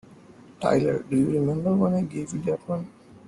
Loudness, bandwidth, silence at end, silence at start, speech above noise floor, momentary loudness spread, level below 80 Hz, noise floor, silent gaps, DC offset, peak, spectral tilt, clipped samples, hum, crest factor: -25 LUFS; 11 kHz; 0.4 s; 0.1 s; 25 dB; 9 LU; -58 dBFS; -49 dBFS; none; under 0.1%; -10 dBFS; -8 dB/octave; under 0.1%; none; 16 dB